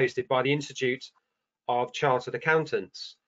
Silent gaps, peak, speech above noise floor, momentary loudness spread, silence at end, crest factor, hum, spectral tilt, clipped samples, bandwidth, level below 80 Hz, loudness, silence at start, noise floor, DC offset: none; -10 dBFS; 19 dB; 12 LU; 0.15 s; 20 dB; none; -5 dB/octave; under 0.1%; 8 kHz; -74 dBFS; -28 LUFS; 0 s; -47 dBFS; under 0.1%